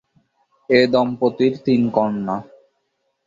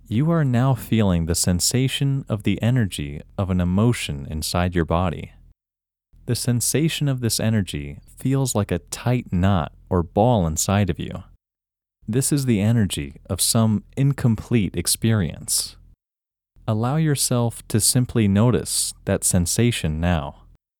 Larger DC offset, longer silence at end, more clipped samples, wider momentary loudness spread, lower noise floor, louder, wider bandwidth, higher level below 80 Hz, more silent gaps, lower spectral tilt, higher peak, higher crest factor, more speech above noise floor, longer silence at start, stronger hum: neither; first, 0.85 s vs 0.5 s; neither; about the same, 10 LU vs 9 LU; second, -71 dBFS vs -89 dBFS; first, -18 LUFS vs -21 LUFS; second, 7.4 kHz vs 19.5 kHz; second, -60 dBFS vs -40 dBFS; neither; first, -7.5 dB/octave vs -5 dB/octave; about the same, -2 dBFS vs -4 dBFS; about the same, 18 dB vs 18 dB; second, 53 dB vs 69 dB; first, 0.7 s vs 0.1 s; neither